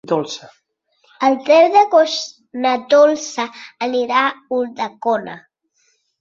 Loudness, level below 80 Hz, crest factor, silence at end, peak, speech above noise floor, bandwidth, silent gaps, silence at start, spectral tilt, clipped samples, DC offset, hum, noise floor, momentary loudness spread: -16 LUFS; -68 dBFS; 16 dB; 0.8 s; -2 dBFS; 47 dB; 7.6 kHz; none; 0.05 s; -3.5 dB/octave; under 0.1%; under 0.1%; none; -63 dBFS; 16 LU